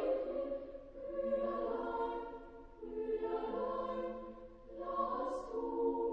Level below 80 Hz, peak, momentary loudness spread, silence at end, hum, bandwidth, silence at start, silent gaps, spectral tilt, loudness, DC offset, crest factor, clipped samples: -60 dBFS; -24 dBFS; 14 LU; 0 s; none; 9 kHz; 0 s; none; -7 dB/octave; -40 LUFS; under 0.1%; 16 dB; under 0.1%